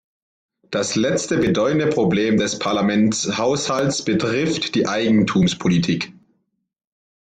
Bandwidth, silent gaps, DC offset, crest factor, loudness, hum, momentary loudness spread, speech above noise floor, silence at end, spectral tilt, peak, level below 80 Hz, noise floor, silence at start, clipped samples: 9.4 kHz; none; under 0.1%; 14 dB; -19 LUFS; none; 4 LU; 52 dB; 1.2 s; -5 dB/octave; -6 dBFS; -52 dBFS; -70 dBFS; 0.7 s; under 0.1%